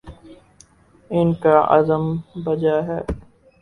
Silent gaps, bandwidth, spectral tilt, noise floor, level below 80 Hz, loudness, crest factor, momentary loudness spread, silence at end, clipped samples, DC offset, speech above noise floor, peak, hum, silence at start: none; 10.5 kHz; -8.5 dB/octave; -52 dBFS; -42 dBFS; -19 LUFS; 20 dB; 12 LU; 0.4 s; under 0.1%; under 0.1%; 34 dB; 0 dBFS; none; 0.05 s